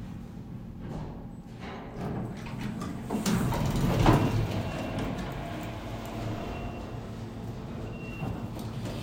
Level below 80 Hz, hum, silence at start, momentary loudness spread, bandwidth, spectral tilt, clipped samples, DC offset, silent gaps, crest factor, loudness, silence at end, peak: -42 dBFS; none; 0 s; 15 LU; 16 kHz; -6.5 dB/octave; under 0.1%; under 0.1%; none; 24 dB; -33 LUFS; 0 s; -8 dBFS